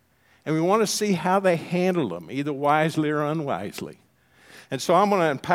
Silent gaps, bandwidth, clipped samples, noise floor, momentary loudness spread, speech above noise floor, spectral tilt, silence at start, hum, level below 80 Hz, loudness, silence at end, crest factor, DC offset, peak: none; 16.5 kHz; under 0.1%; -55 dBFS; 12 LU; 32 dB; -5 dB/octave; 0.45 s; none; -70 dBFS; -23 LUFS; 0 s; 18 dB; under 0.1%; -6 dBFS